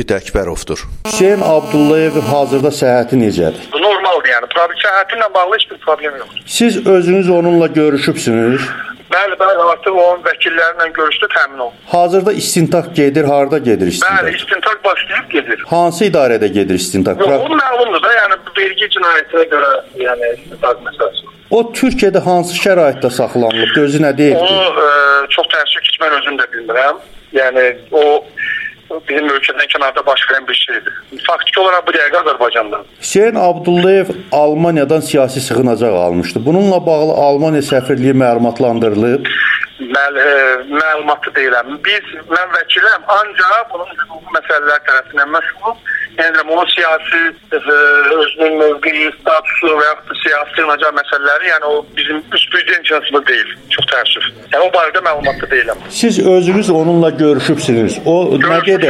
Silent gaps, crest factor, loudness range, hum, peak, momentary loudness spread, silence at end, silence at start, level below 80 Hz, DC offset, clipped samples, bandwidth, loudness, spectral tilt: none; 12 dB; 2 LU; none; 0 dBFS; 6 LU; 0 s; 0 s; -42 dBFS; under 0.1%; under 0.1%; 15 kHz; -12 LUFS; -4 dB/octave